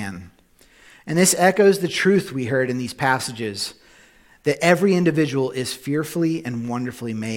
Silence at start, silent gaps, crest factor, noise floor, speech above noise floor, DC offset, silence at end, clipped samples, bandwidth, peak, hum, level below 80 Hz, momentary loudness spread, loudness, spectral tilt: 0 s; none; 20 dB; -54 dBFS; 34 dB; under 0.1%; 0 s; under 0.1%; 17 kHz; -2 dBFS; none; -60 dBFS; 13 LU; -20 LUFS; -4.5 dB/octave